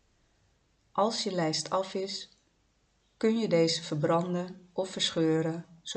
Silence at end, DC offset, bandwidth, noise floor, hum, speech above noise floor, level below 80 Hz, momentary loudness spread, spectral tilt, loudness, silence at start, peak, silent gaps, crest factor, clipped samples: 0 s; under 0.1%; 9 kHz; -71 dBFS; none; 41 dB; -74 dBFS; 10 LU; -4.5 dB/octave; -30 LUFS; 0.95 s; -14 dBFS; none; 18 dB; under 0.1%